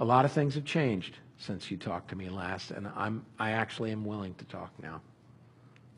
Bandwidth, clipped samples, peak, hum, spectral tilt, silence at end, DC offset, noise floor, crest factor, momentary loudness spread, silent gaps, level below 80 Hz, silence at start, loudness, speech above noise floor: 11 kHz; under 0.1%; -10 dBFS; none; -6.5 dB/octave; 0.05 s; under 0.1%; -58 dBFS; 22 dB; 15 LU; none; -68 dBFS; 0 s; -34 LUFS; 25 dB